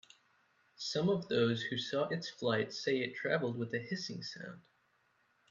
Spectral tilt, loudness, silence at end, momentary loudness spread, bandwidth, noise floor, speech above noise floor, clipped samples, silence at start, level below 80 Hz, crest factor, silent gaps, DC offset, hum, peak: -5 dB/octave; -36 LUFS; 0.9 s; 11 LU; 7.6 kHz; -74 dBFS; 39 dB; under 0.1%; 0.8 s; -78 dBFS; 18 dB; none; under 0.1%; none; -18 dBFS